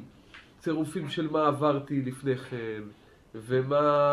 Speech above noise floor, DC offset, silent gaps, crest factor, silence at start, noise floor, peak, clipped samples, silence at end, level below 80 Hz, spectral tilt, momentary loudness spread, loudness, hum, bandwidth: 25 dB; under 0.1%; none; 18 dB; 0 s; -53 dBFS; -10 dBFS; under 0.1%; 0 s; -64 dBFS; -7 dB/octave; 19 LU; -29 LUFS; none; 14 kHz